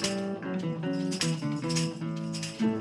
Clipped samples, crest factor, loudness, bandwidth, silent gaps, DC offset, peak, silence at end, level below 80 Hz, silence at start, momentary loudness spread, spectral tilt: under 0.1%; 16 dB; -31 LUFS; 13 kHz; none; under 0.1%; -14 dBFS; 0 s; -66 dBFS; 0 s; 5 LU; -5 dB/octave